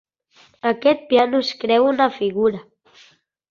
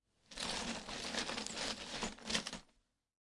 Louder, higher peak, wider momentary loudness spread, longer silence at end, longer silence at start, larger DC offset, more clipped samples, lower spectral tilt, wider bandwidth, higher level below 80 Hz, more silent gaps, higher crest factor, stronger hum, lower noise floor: first, -19 LUFS vs -41 LUFS; first, -4 dBFS vs -20 dBFS; about the same, 7 LU vs 6 LU; first, 0.9 s vs 0.7 s; first, 0.65 s vs 0.3 s; neither; neither; first, -5.5 dB/octave vs -1.5 dB/octave; second, 7.2 kHz vs 11.5 kHz; about the same, -64 dBFS vs -62 dBFS; neither; second, 18 dB vs 24 dB; neither; second, -55 dBFS vs -77 dBFS